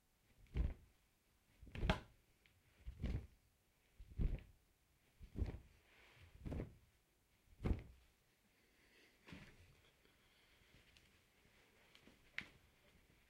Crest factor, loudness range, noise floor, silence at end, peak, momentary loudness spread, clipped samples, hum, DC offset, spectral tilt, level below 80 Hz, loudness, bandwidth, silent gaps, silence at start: 30 dB; 17 LU; -78 dBFS; 0.8 s; -20 dBFS; 23 LU; under 0.1%; none; under 0.1%; -6.5 dB/octave; -54 dBFS; -49 LUFS; 15.5 kHz; none; 0.4 s